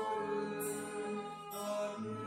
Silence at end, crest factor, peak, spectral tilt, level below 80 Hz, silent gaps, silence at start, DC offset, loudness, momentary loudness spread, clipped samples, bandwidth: 0 s; 12 dB; -28 dBFS; -4.5 dB/octave; -78 dBFS; none; 0 s; under 0.1%; -40 LUFS; 5 LU; under 0.1%; 16 kHz